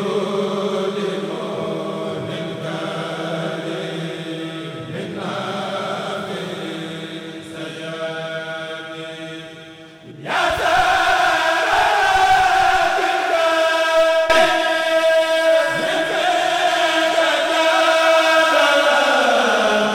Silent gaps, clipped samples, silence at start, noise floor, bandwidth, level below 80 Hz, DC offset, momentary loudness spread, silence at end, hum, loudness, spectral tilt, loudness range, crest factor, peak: none; under 0.1%; 0 s; -39 dBFS; 16.5 kHz; -50 dBFS; under 0.1%; 15 LU; 0 s; none; -18 LUFS; -3 dB/octave; 12 LU; 16 dB; -4 dBFS